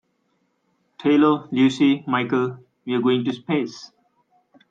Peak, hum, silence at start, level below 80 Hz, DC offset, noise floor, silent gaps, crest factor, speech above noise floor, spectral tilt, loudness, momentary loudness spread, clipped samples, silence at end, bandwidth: -6 dBFS; none; 1 s; -70 dBFS; under 0.1%; -69 dBFS; none; 18 dB; 49 dB; -6.5 dB/octave; -21 LUFS; 11 LU; under 0.1%; 0.85 s; 7.8 kHz